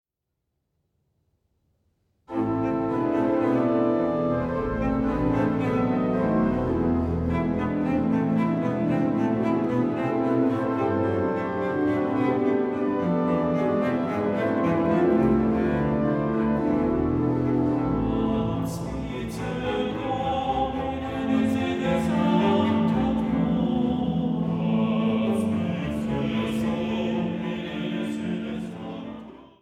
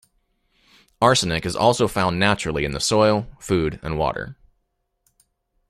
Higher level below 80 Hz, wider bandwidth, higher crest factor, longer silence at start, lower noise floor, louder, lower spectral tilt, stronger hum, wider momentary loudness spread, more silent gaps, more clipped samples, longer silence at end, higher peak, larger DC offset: about the same, -44 dBFS vs -44 dBFS; second, 12 kHz vs 14.5 kHz; second, 14 dB vs 20 dB; first, 2.3 s vs 1 s; first, -81 dBFS vs -73 dBFS; second, -25 LUFS vs -20 LUFS; first, -8 dB/octave vs -4.5 dB/octave; neither; about the same, 7 LU vs 8 LU; neither; neither; second, 0.15 s vs 1.35 s; second, -10 dBFS vs -2 dBFS; neither